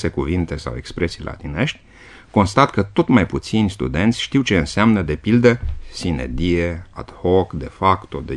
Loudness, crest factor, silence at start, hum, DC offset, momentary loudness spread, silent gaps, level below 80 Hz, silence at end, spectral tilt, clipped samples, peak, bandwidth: -19 LUFS; 18 dB; 0 s; none; 0.1%; 12 LU; none; -34 dBFS; 0 s; -6.5 dB/octave; under 0.1%; 0 dBFS; 11 kHz